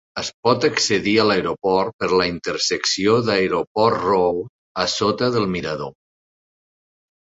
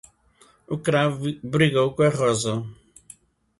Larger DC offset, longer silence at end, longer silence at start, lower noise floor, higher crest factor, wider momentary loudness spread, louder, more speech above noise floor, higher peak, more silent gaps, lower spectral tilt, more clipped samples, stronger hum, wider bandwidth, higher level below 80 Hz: neither; first, 1.4 s vs 0.85 s; second, 0.15 s vs 0.7 s; first, under -90 dBFS vs -58 dBFS; about the same, 18 dB vs 18 dB; about the same, 9 LU vs 11 LU; first, -19 LUFS vs -22 LUFS; first, over 71 dB vs 36 dB; first, -2 dBFS vs -6 dBFS; first, 0.34-0.43 s, 1.93-1.99 s, 3.67-3.75 s, 4.49-4.75 s vs none; second, -4 dB/octave vs -5.5 dB/octave; neither; neither; second, 8 kHz vs 11.5 kHz; first, -52 dBFS vs -58 dBFS